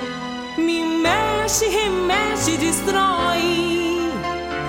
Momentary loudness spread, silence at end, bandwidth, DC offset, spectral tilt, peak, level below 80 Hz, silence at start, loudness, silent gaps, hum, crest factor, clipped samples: 7 LU; 0 s; 16.5 kHz; under 0.1%; -3 dB/octave; -4 dBFS; -42 dBFS; 0 s; -20 LUFS; none; none; 16 dB; under 0.1%